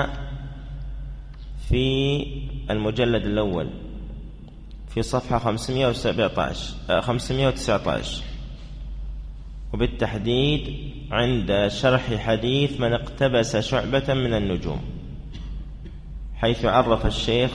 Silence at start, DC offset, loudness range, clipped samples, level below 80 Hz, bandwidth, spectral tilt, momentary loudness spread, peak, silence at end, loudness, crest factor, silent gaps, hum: 0 s; under 0.1%; 4 LU; under 0.1%; -34 dBFS; 11 kHz; -6 dB/octave; 17 LU; -6 dBFS; 0 s; -23 LUFS; 18 dB; none; none